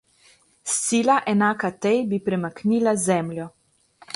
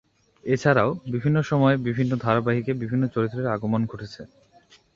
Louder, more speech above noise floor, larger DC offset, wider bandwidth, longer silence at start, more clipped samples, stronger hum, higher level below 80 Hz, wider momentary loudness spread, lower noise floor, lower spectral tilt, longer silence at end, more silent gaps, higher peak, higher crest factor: about the same, -22 LUFS vs -23 LUFS; about the same, 36 dB vs 33 dB; neither; first, 11.5 kHz vs 7.6 kHz; first, 0.65 s vs 0.45 s; neither; neither; second, -64 dBFS vs -56 dBFS; about the same, 12 LU vs 11 LU; about the same, -57 dBFS vs -56 dBFS; second, -4.5 dB/octave vs -8 dB/octave; second, 0 s vs 0.7 s; neither; about the same, -6 dBFS vs -4 dBFS; about the same, 18 dB vs 20 dB